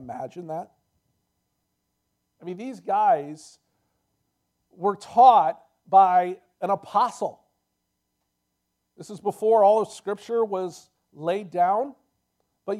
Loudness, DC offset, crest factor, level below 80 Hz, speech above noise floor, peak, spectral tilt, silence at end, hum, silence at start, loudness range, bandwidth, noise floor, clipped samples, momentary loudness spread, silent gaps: -22 LUFS; under 0.1%; 22 dB; -78 dBFS; 55 dB; -4 dBFS; -5.5 dB/octave; 0 s; none; 0 s; 9 LU; 12 kHz; -78 dBFS; under 0.1%; 19 LU; none